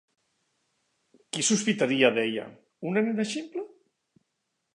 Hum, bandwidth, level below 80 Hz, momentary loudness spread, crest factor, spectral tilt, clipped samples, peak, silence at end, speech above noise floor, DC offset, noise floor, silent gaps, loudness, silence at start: none; 11 kHz; -80 dBFS; 16 LU; 22 dB; -3.5 dB/octave; under 0.1%; -8 dBFS; 1.05 s; 54 dB; under 0.1%; -80 dBFS; none; -26 LUFS; 1.35 s